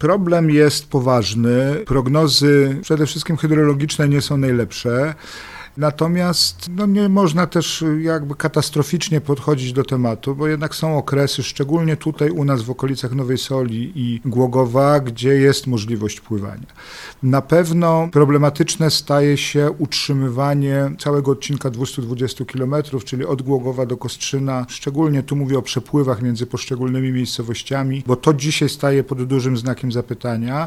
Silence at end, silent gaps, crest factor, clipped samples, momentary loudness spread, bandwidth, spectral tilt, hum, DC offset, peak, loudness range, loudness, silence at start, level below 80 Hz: 0 s; none; 16 dB; under 0.1%; 9 LU; 15 kHz; -5.5 dB/octave; none; under 0.1%; 0 dBFS; 4 LU; -18 LUFS; 0 s; -46 dBFS